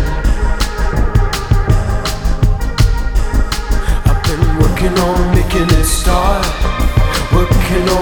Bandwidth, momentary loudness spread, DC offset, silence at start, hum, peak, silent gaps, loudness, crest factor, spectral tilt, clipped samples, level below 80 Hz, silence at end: over 20 kHz; 5 LU; under 0.1%; 0 s; none; 0 dBFS; none; -15 LUFS; 12 dB; -5.5 dB/octave; under 0.1%; -14 dBFS; 0 s